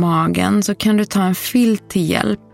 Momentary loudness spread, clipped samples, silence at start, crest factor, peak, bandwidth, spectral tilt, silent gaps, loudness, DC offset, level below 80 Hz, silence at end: 3 LU; under 0.1%; 0 s; 16 dB; 0 dBFS; 16.5 kHz; -5.5 dB/octave; none; -16 LUFS; under 0.1%; -48 dBFS; 0.2 s